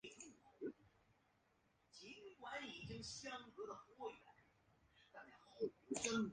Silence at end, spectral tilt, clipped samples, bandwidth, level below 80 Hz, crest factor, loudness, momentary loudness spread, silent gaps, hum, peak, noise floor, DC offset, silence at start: 0 s; -3.5 dB/octave; under 0.1%; 9.6 kHz; -78 dBFS; 28 dB; -50 LUFS; 18 LU; none; none; -24 dBFS; -80 dBFS; under 0.1%; 0.05 s